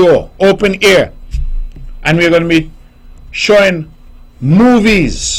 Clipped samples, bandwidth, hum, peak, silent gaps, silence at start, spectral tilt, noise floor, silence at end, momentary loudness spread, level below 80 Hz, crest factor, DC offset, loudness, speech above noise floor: under 0.1%; 16 kHz; none; -2 dBFS; none; 0 s; -5 dB/octave; -35 dBFS; 0 s; 17 LU; -24 dBFS; 10 dB; under 0.1%; -10 LUFS; 26 dB